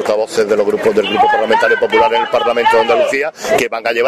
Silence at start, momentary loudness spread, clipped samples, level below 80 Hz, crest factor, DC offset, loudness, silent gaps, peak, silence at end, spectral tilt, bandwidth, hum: 0 s; 4 LU; under 0.1%; -50 dBFS; 12 dB; under 0.1%; -13 LUFS; none; -2 dBFS; 0 s; -3.5 dB/octave; 15 kHz; none